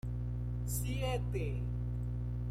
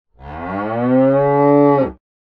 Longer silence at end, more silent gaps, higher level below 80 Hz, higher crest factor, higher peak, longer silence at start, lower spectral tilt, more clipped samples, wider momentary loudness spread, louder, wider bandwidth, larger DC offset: second, 0 s vs 0.4 s; neither; about the same, -40 dBFS vs -44 dBFS; about the same, 12 dB vs 14 dB; second, -24 dBFS vs -2 dBFS; second, 0.05 s vs 0.2 s; second, -6 dB/octave vs -11 dB/octave; neither; second, 3 LU vs 15 LU; second, -38 LUFS vs -15 LUFS; first, 15.5 kHz vs 5 kHz; neither